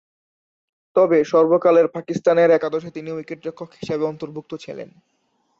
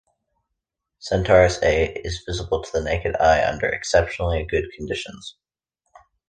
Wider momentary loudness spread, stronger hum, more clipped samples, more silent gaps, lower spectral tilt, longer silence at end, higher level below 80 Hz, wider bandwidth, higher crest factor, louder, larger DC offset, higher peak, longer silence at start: first, 18 LU vs 13 LU; neither; neither; neither; first, -7 dB/octave vs -5 dB/octave; second, 0.75 s vs 1 s; second, -64 dBFS vs -36 dBFS; second, 7.2 kHz vs 9.8 kHz; about the same, 16 dB vs 20 dB; first, -18 LUFS vs -21 LUFS; neither; about the same, -4 dBFS vs -2 dBFS; about the same, 0.95 s vs 1 s